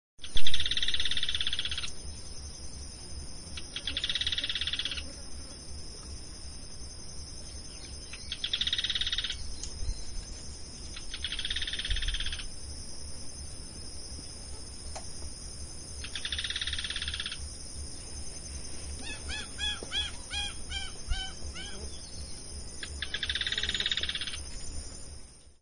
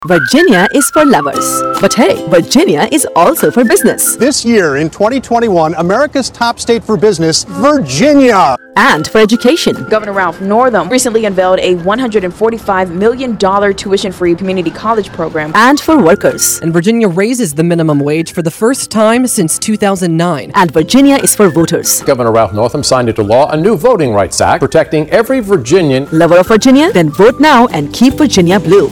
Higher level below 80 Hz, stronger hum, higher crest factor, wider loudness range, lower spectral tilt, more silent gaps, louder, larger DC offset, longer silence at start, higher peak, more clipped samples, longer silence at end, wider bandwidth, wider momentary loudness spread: about the same, -44 dBFS vs -40 dBFS; neither; first, 24 dB vs 8 dB; first, 6 LU vs 3 LU; second, -1.5 dB/octave vs -4.5 dB/octave; neither; second, -35 LUFS vs -9 LUFS; neither; first, 0.2 s vs 0 s; second, -6 dBFS vs 0 dBFS; second, under 0.1% vs 0.6%; about the same, 0.05 s vs 0 s; second, 10.5 kHz vs over 20 kHz; first, 14 LU vs 6 LU